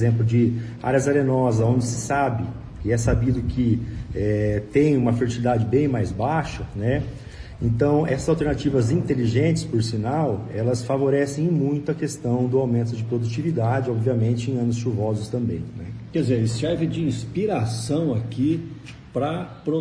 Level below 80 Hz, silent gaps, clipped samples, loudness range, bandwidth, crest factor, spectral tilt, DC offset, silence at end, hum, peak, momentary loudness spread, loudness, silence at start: -40 dBFS; none; under 0.1%; 3 LU; 11 kHz; 16 dB; -7 dB/octave; under 0.1%; 0 s; none; -6 dBFS; 8 LU; -23 LUFS; 0 s